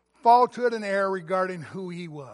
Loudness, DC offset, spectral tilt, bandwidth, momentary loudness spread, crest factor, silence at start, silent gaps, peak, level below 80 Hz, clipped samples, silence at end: -23 LUFS; under 0.1%; -6 dB/octave; 11.5 kHz; 17 LU; 18 dB; 0.25 s; none; -6 dBFS; -76 dBFS; under 0.1%; 0 s